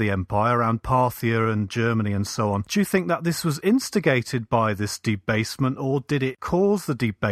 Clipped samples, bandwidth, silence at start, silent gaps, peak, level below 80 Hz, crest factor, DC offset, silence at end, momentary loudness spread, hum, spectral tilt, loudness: under 0.1%; 15.5 kHz; 0 s; none; -4 dBFS; -48 dBFS; 18 dB; under 0.1%; 0 s; 4 LU; none; -6 dB/octave; -23 LUFS